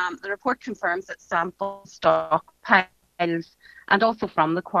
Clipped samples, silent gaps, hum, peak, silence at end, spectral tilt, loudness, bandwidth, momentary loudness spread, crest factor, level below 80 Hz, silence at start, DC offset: under 0.1%; none; none; 0 dBFS; 0 s; -5.5 dB/octave; -24 LUFS; 7.6 kHz; 11 LU; 24 dB; -62 dBFS; 0 s; under 0.1%